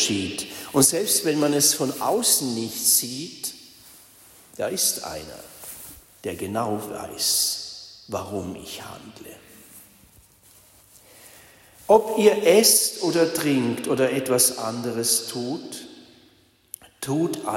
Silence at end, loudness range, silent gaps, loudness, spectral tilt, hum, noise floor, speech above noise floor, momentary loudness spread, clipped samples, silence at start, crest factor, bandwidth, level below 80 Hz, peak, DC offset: 0 s; 10 LU; none; -21 LUFS; -2.5 dB/octave; none; -58 dBFS; 36 dB; 21 LU; under 0.1%; 0 s; 20 dB; 16.5 kHz; -62 dBFS; -4 dBFS; under 0.1%